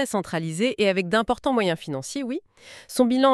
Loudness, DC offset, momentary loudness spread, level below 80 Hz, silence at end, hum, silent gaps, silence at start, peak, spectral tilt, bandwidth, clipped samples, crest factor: -24 LUFS; under 0.1%; 10 LU; -56 dBFS; 0 s; none; none; 0 s; -4 dBFS; -5 dB/octave; 13.5 kHz; under 0.1%; 18 dB